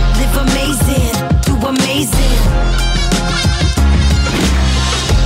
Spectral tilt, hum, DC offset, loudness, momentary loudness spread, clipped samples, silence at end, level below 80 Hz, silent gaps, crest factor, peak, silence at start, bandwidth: -4.5 dB/octave; none; 0.3%; -14 LUFS; 2 LU; under 0.1%; 0 s; -14 dBFS; none; 8 dB; -4 dBFS; 0 s; 16.5 kHz